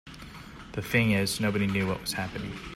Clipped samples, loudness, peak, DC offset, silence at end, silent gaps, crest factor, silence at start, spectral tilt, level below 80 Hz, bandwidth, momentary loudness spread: under 0.1%; -28 LUFS; -12 dBFS; under 0.1%; 0 s; none; 18 dB; 0.05 s; -5 dB/octave; -50 dBFS; 16 kHz; 20 LU